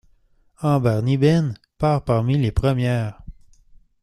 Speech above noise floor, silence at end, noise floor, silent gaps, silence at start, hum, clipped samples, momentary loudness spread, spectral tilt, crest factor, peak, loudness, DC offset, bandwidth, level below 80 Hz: 39 dB; 0.7 s; -58 dBFS; none; 0.6 s; none; under 0.1%; 8 LU; -8 dB/octave; 16 dB; -4 dBFS; -21 LUFS; under 0.1%; 12.5 kHz; -38 dBFS